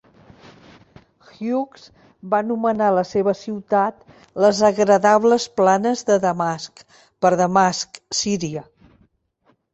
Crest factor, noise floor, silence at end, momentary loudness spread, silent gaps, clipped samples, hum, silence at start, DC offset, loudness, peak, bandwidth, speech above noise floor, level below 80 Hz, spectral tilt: 18 dB; -63 dBFS; 1.1 s; 12 LU; none; under 0.1%; none; 1.4 s; under 0.1%; -19 LUFS; -2 dBFS; 8.2 kHz; 44 dB; -60 dBFS; -4.5 dB/octave